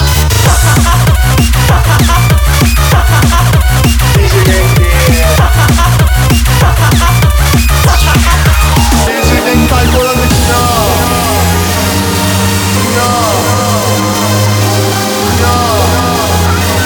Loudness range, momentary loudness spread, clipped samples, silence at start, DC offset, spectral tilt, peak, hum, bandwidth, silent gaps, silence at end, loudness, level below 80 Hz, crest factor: 2 LU; 2 LU; under 0.1%; 0 s; under 0.1%; -4.5 dB/octave; 0 dBFS; none; over 20 kHz; none; 0 s; -8 LUFS; -12 dBFS; 8 dB